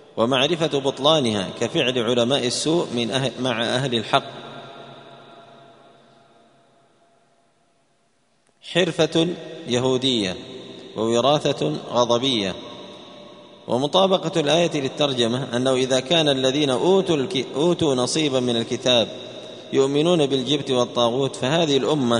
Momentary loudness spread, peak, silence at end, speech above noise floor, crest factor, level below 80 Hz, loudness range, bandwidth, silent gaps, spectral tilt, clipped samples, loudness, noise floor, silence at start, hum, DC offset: 16 LU; 0 dBFS; 0 s; 45 dB; 22 dB; -60 dBFS; 7 LU; 10.5 kHz; none; -4.5 dB/octave; under 0.1%; -21 LUFS; -65 dBFS; 0.15 s; none; under 0.1%